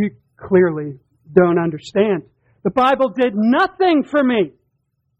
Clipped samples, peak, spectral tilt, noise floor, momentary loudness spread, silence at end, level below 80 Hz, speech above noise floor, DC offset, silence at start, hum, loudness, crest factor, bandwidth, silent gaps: under 0.1%; 0 dBFS; -7.5 dB/octave; -69 dBFS; 9 LU; 0.7 s; -56 dBFS; 53 dB; under 0.1%; 0 s; none; -17 LUFS; 18 dB; 8 kHz; none